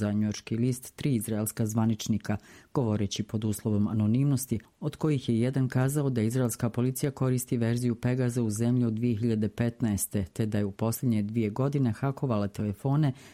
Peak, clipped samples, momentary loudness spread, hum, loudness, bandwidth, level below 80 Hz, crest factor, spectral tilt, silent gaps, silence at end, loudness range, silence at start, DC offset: -14 dBFS; under 0.1%; 4 LU; none; -29 LUFS; 16 kHz; -58 dBFS; 14 dB; -6.5 dB/octave; none; 0 s; 2 LU; 0 s; under 0.1%